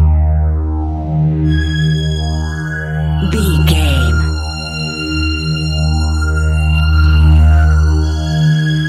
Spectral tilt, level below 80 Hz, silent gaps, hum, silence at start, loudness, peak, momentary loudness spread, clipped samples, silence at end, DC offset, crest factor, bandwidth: -6 dB/octave; -16 dBFS; none; none; 0 s; -14 LUFS; 0 dBFS; 9 LU; under 0.1%; 0 s; under 0.1%; 12 dB; 13 kHz